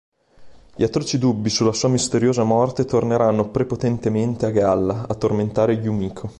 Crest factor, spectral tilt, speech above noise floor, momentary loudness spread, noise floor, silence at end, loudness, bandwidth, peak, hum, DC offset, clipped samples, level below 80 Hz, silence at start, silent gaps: 14 dB; -6 dB/octave; 25 dB; 4 LU; -44 dBFS; 0.05 s; -20 LUFS; 11.5 kHz; -6 dBFS; none; under 0.1%; under 0.1%; -46 dBFS; 0.4 s; none